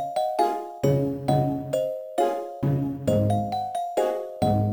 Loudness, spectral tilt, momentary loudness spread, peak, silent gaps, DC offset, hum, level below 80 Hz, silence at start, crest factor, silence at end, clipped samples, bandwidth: -25 LUFS; -7.5 dB/octave; 4 LU; -8 dBFS; none; under 0.1%; none; -50 dBFS; 0 s; 16 dB; 0 s; under 0.1%; over 20 kHz